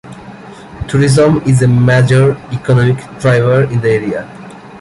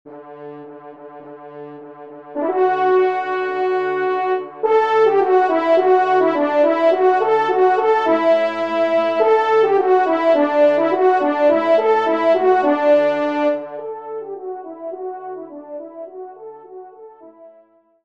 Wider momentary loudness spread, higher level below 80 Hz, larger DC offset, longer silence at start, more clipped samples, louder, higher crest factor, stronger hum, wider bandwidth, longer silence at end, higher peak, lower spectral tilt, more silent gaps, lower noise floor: about the same, 23 LU vs 21 LU; first, -38 dBFS vs -72 dBFS; neither; about the same, 0.05 s vs 0.05 s; neither; first, -11 LUFS vs -16 LUFS; about the same, 12 dB vs 14 dB; neither; first, 11.5 kHz vs 7 kHz; second, 0 s vs 0.55 s; about the same, 0 dBFS vs -2 dBFS; about the same, -7 dB/octave vs -6 dB/octave; neither; second, -32 dBFS vs -53 dBFS